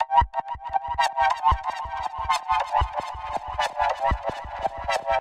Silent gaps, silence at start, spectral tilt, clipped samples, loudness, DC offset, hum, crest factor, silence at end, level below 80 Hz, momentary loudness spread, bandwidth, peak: none; 0 s; -3.5 dB/octave; under 0.1%; -26 LUFS; under 0.1%; none; 18 dB; 0 s; -36 dBFS; 9 LU; 14 kHz; -6 dBFS